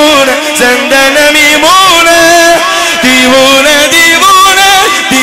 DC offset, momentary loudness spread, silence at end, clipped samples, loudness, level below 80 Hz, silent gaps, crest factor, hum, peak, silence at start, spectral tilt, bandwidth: under 0.1%; 4 LU; 0 s; 1%; -3 LUFS; -36 dBFS; none; 4 dB; none; 0 dBFS; 0 s; -1 dB/octave; over 20 kHz